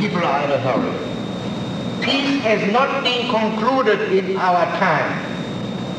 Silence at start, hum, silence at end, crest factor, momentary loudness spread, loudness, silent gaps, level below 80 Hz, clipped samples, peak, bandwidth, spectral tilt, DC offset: 0 s; none; 0 s; 16 dB; 9 LU; -19 LUFS; none; -52 dBFS; under 0.1%; -4 dBFS; 10 kHz; -5.5 dB/octave; under 0.1%